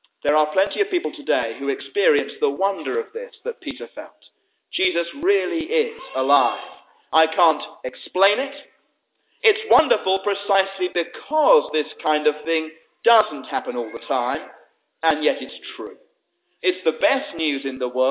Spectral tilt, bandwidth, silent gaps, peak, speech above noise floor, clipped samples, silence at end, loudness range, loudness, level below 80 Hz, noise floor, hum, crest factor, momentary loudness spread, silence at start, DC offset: -6.5 dB/octave; 4 kHz; none; -2 dBFS; 50 dB; under 0.1%; 0 s; 5 LU; -21 LUFS; -64 dBFS; -71 dBFS; none; 20 dB; 14 LU; 0.25 s; under 0.1%